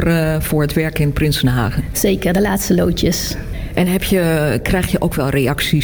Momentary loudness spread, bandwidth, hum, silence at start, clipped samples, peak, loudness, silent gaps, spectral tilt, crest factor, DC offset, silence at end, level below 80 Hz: 3 LU; 19.5 kHz; none; 0 s; under 0.1%; -4 dBFS; -16 LUFS; none; -5.5 dB/octave; 12 dB; under 0.1%; 0 s; -28 dBFS